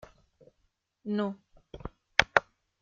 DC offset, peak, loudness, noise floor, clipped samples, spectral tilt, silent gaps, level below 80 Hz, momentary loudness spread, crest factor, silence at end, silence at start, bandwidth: under 0.1%; -2 dBFS; -29 LUFS; -76 dBFS; under 0.1%; -4 dB/octave; none; -56 dBFS; 21 LU; 32 dB; 0.4 s; 1.05 s; 7.6 kHz